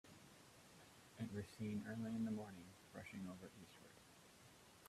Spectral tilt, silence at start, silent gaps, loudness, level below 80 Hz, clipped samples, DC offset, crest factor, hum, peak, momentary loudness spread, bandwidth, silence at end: -6 dB/octave; 0.05 s; none; -50 LUFS; -80 dBFS; under 0.1%; under 0.1%; 16 dB; none; -36 dBFS; 19 LU; 14.5 kHz; 0 s